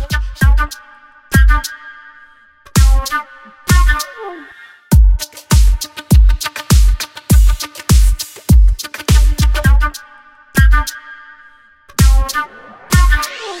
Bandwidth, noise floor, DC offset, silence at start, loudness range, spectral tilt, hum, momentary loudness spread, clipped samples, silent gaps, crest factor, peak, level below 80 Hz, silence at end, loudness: 16.5 kHz; -44 dBFS; under 0.1%; 0 s; 3 LU; -4.5 dB/octave; none; 15 LU; under 0.1%; none; 12 dB; 0 dBFS; -14 dBFS; 0 s; -14 LUFS